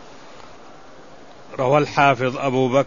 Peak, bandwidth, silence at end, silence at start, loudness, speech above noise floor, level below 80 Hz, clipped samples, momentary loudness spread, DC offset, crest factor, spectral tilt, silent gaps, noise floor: -2 dBFS; 7.4 kHz; 0 s; 0 s; -19 LUFS; 26 dB; -58 dBFS; under 0.1%; 8 LU; 0.7%; 20 dB; -6 dB/octave; none; -44 dBFS